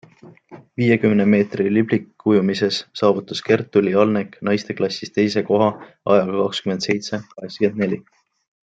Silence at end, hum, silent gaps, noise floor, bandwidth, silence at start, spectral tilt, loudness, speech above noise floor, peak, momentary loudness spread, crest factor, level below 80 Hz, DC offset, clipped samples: 0.65 s; none; none; -46 dBFS; 7.8 kHz; 0.25 s; -6.5 dB/octave; -19 LUFS; 27 dB; -2 dBFS; 8 LU; 18 dB; -64 dBFS; under 0.1%; under 0.1%